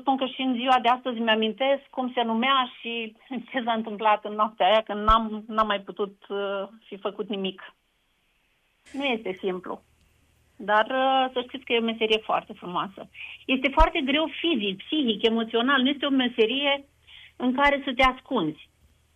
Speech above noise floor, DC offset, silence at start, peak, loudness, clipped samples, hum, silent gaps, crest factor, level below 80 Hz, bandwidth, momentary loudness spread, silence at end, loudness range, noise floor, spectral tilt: 44 dB; under 0.1%; 0 s; -4 dBFS; -25 LUFS; under 0.1%; none; none; 22 dB; -42 dBFS; 9.4 kHz; 12 LU; 0.55 s; 9 LU; -69 dBFS; -5.5 dB/octave